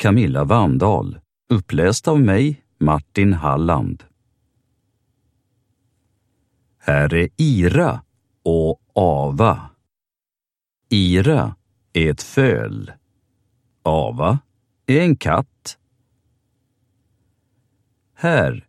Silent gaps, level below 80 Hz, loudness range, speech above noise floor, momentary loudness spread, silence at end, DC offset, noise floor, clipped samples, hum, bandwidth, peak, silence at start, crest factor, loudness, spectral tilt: none; -40 dBFS; 7 LU; over 73 dB; 12 LU; 0.1 s; under 0.1%; under -90 dBFS; under 0.1%; none; 13 kHz; 0 dBFS; 0 s; 20 dB; -18 LUFS; -6.5 dB/octave